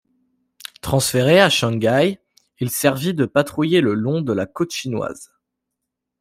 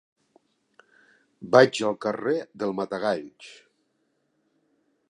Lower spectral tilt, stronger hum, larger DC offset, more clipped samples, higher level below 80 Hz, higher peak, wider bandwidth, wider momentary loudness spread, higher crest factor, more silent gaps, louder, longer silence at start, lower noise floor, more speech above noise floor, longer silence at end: about the same, -5 dB/octave vs -5 dB/octave; neither; neither; neither; first, -52 dBFS vs -74 dBFS; about the same, -2 dBFS vs -2 dBFS; first, 16 kHz vs 11 kHz; second, 16 LU vs 27 LU; second, 18 dB vs 26 dB; neither; first, -19 LUFS vs -24 LUFS; second, 0.85 s vs 1.4 s; first, -80 dBFS vs -73 dBFS; first, 62 dB vs 49 dB; second, 0.95 s vs 1.6 s